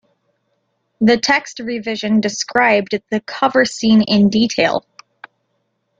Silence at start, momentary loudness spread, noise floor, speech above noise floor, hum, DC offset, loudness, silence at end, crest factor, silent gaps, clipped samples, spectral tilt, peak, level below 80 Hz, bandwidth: 1 s; 10 LU; -68 dBFS; 53 dB; none; under 0.1%; -16 LUFS; 1.2 s; 18 dB; none; under 0.1%; -4.5 dB/octave; 0 dBFS; -56 dBFS; 7.8 kHz